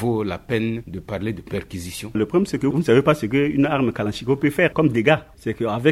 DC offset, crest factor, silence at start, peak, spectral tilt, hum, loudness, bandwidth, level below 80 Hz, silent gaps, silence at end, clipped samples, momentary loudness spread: under 0.1%; 20 dB; 0 s; -2 dBFS; -6.5 dB/octave; none; -21 LUFS; 15 kHz; -48 dBFS; none; 0 s; under 0.1%; 12 LU